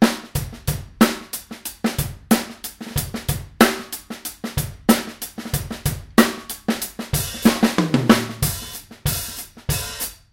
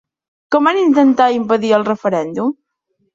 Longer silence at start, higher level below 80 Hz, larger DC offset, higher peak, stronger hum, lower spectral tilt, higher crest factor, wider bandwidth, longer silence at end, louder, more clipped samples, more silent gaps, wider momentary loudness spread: second, 0 s vs 0.5 s; first, -38 dBFS vs -62 dBFS; neither; about the same, 0 dBFS vs -2 dBFS; neither; second, -4.5 dB/octave vs -6 dB/octave; first, 22 dB vs 14 dB; first, 17 kHz vs 7.6 kHz; second, 0.2 s vs 0.6 s; second, -22 LUFS vs -14 LUFS; neither; neither; first, 13 LU vs 9 LU